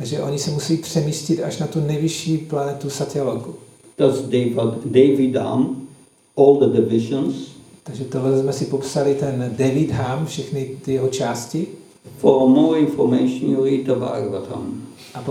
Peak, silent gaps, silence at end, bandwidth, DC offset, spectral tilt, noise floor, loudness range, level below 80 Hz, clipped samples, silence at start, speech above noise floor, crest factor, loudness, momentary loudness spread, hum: -2 dBFS; none; 0 s; 14.5 kHz; under 0.1%; -6.5 dB/octave; -48 dBFS; 4 LU; -58 dBFS; under 0.1%; 0 s; 29 dB; 18 dB; -19 LUFS; 15 LU; none